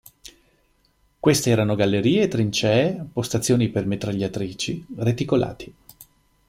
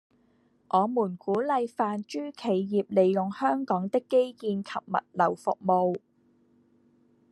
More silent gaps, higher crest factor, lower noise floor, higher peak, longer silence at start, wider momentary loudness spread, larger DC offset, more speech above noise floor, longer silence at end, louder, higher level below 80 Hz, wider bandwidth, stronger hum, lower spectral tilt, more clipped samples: neither; about the same, 18 dB vs 18 dB; about the same, -63 dBFS vs -66 dBFS; first, -4 dBFS vs -10 dBFS; first, 1.25 s vs 0.75 s; about the same, 9 LU vs 7 LU; neither; about the same, 42 dB vs 39 dB; second, 0.45 s vs 1.35 s; first, -22 LUFS vs -28 LUFS; first, -52 dBFS vs -76 dBFS; first, 16.5 kHz vs 11.5 kHz; neither; second, -5.5 dB/octave vs -7.5 dB/octave; neither